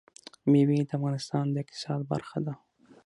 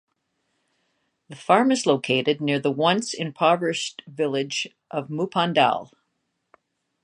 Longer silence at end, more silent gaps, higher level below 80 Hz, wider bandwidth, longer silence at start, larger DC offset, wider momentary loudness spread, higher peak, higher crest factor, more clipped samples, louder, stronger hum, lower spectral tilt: second, 0.5 s vs 1.15 s; neither; about the same, -70 dBFS vs -72 dBFS; about the same, 11.5 kHz vs 11 kHz; second, 0.45 s vs 1.3 s; neither; about the same, 12 LU vs 11 LU; second, -12 dBFS vs -2 dBFS; second, 16 dB vs 22 dB; neither; second, -29 LUFS vs -23 LUFS; neither; first, -7.5 dB/octave vs -4.5 dB/octave